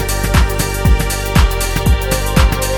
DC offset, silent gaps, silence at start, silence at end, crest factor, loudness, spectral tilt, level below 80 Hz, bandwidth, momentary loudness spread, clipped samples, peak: under 0.1%; none; 0 s; 0 s; 12 dB; -15 LUFS; -4.5 dB/octave; -16 dBFS; 17.5 kHz; 2 LU; under 0.1%; 0 dBFS